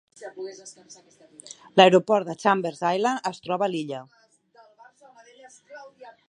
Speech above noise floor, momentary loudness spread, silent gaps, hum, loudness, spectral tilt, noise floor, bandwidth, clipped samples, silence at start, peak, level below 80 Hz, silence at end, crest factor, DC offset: 33 dB; 28 LU; none; none; -22 LUFS; -5 dB/octave; -57 dBFS; 11 kHz; under 0.1%; 0.2 s; 0 dBFS; -76 dBFS; 0.2 s; 26 dB; under 0.1%